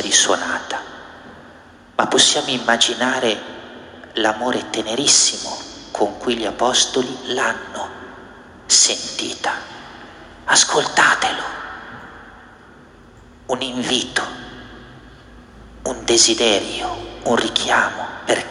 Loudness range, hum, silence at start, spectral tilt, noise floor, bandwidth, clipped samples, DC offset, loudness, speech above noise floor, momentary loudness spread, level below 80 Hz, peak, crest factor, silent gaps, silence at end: 8 LU; none; 0 s; -0.5 dB/octave; -45 dBFS; 12.5 kHz; under 0.1%; under 0.1%; -17 LUFS; 26 dB; 23 LU; -50 dBFS; 0 dBFS; 20 dB; none; 0 s